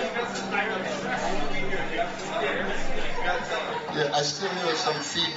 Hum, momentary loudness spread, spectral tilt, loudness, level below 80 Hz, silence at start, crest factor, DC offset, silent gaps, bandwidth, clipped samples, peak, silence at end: none; 4 LU; -3 dB/octave; -28 LUFS; -36 dBFS; 0 s; 14 dB; under 0.1%; none; 8 kHz; under 0.1%; -12 dBFS; 0 s